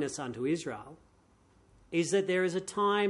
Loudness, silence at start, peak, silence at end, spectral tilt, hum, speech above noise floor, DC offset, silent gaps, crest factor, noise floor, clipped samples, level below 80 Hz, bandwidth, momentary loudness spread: -32 LUFS; 0 s; -16 dBFS; 0 s; -4.5 dB/octave; none; 34 dB; under 0.1%; none; 16 dB; -65 dBFS; under 0.1%; -68 dBFS; 11.5 kHz; 13 LU